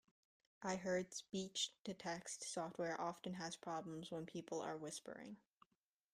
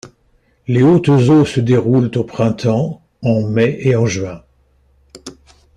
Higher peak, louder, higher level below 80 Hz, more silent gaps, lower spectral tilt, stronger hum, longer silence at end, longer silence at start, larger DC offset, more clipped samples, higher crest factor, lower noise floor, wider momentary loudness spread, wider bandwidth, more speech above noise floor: second, -28 dBFS vs -2 dBFS; second, -47 LUFS vs -14 LUFS; second, -82 dBFS vs -48 dBFS; first, 1.80-1.85 s vs none; second, -3.5 dB/octave vs -7.5 dB/octave; neither; first, 0.75 s vs 0.45 s; first, 0.6 s vs 0.05 s; neither; neither; first, 20 dB vs 14 dB; first, -88 dBFS vs -57 dBFS; second, 8 LU vs 16 LU; first, 15 kHz vs 10 kHz; about the same, 41 dB vs 44 dB